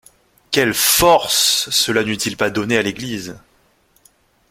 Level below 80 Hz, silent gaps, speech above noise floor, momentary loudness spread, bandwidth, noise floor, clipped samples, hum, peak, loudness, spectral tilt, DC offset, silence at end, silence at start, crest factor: -46 dBFS; none; 41 dB; 14 LU; 16.5 kHz; -58 dBFS; under 0.1%; none; 0 dBFS; -15 LUFS; -2 dB/octave; under 0.1%; 1.15 s; 0.5 s; 18 dB